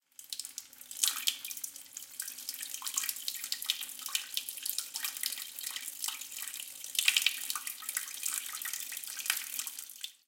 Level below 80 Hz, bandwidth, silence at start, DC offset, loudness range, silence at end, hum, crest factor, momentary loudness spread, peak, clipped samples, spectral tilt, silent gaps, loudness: -90 dBFS; 17 kHz; 0.2 s; under 0.1%; 3 LU; 0.1 s; none; 30 dB; 12 LU; -8 dBFS; under 0.1%; 4.5 dB/octave; none; -34 LUFS